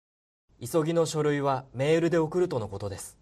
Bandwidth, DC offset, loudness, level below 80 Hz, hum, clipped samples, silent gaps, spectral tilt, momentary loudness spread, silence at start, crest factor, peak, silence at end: 14.5 kHz; under 0.1%; -27 LUFS; -60 dBFS; none; under 0.1%; none; -6 dB/octave; 12 LU; 0.6 s; 14 dB; -12 dBFS; 0.1 s